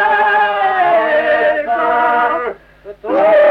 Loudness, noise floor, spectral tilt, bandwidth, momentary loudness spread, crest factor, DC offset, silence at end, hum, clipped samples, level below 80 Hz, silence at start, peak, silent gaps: -13 LUFS; -36 dBFS; -5 dB/octave; 5.4 kHz; 9 LU; 10 dB; under 0.1%; 0 s; none; under 0.1%; -52 dBFS; 0 s; -2 dBFS; none